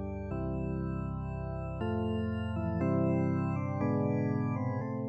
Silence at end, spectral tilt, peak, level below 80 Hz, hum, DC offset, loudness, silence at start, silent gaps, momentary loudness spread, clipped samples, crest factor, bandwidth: 0 s; -10.5 dB/octave; -18 dBFS; -48 dBFS; none; under 0.1%; -33 LUFS; 0 s; none; 8 LU; under 0.1%; 14 dB; 7.8 kHz